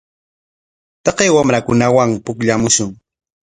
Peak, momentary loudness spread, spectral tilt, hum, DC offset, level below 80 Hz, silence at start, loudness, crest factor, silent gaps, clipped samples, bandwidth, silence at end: 0 dBFS; 7 LU; -4 dB/octave; none; under 0.1%; -48 dBFS; 1.05 s; -14 LUFS; 16 dB; none; under 0.1%; 10.5 kHz; 0.55 s